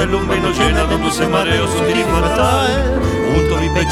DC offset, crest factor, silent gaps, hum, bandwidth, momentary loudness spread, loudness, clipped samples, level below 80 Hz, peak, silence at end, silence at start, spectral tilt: under 0.1%; 14 dB; none; none; 15.5 kHz; 2 LU; -15 LUFS; under 0.1%; -24 dBFS; 0 dBFS; 0 s; 0 s; -5 dB/octave